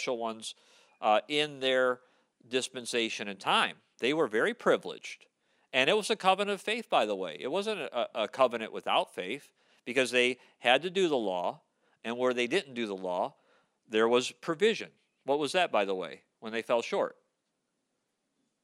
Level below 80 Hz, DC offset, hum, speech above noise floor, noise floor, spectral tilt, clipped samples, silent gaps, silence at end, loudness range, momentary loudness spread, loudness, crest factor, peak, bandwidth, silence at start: -90 dBFS; under 0.1%; none; 51 dB; -81 dBFS; -3 dB/octave; under 0.1%; none; 1.5 s; 3 LU; 12 LU; -30 LUFS; 22 dB; -10 dBFS; 14.5 kHz; 0 s